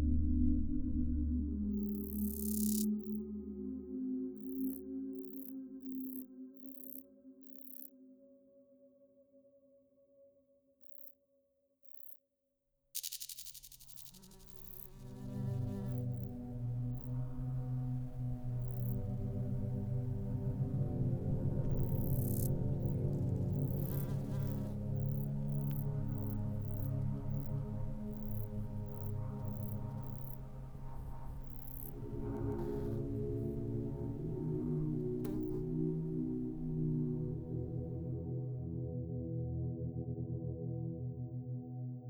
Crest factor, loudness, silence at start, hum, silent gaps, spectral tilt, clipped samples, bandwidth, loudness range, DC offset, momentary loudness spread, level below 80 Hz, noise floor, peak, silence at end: 18 dB; -40 LUFS; 0 s; none; none; -8 dB/octave; under 0.1%; over 20 kHz; 13 LU; under 0.1%; 12 LU; -48 dBFS; -83 dBFS; -20 dBFS; 0 s